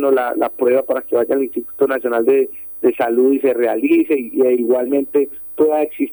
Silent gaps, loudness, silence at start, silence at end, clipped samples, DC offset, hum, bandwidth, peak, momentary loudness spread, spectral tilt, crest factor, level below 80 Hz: none; -17 LUFS; 0 s; 0 s; under 0.1%; under 0.1%; none; over 20 kHz; -4 dBFS; 4 LU; -8 dB/octave; 14 dB; -60 dBFS